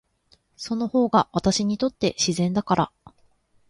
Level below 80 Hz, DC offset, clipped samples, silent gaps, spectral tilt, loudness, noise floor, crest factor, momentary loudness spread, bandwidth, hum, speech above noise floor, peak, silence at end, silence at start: -54 dBFS; under 0.1%; under 0.1%; none; -5 dB/octave; -23 LUFS; -63 dBFS; 20 dB; 9 LU; 11.5 kHz; none; 40 dB; -6 dBFS; 0.8 s; 0.6 s